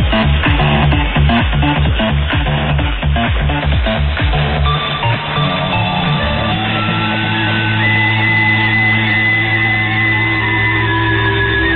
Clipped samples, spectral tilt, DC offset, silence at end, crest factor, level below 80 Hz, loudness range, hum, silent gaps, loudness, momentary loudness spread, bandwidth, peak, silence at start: under 0.1%; -10 dB/octave; under 0.1%; 0 s; 12 dB; -20 dBFS; 3 LU; none; none; -13 LUFS; 4 LU; 4.6 kHz; 0 dBFS; 0 s